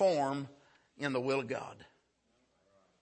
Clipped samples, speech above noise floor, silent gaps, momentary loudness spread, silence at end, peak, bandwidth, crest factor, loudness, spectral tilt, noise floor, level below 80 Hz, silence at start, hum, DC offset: under 0.1%; 41 dB; none; 14 LU; 1.15 s; -20 dBFS; 8.4 kHz; 18 dB; -35 LUFS; -5.5 dB/octave; -75 dBFS; -80 dBFS; 0 s; none; under 0.1%